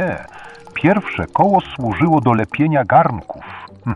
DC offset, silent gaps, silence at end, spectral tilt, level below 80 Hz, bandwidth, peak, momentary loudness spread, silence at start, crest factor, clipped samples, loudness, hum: 0.1%; none; 0 s; -8.5 dB/octave; -46 dBFS; 10 kHz; -2 dBFS; 18 LU; 0 s; 16 dB; under 0.1%; -16 LUFS; none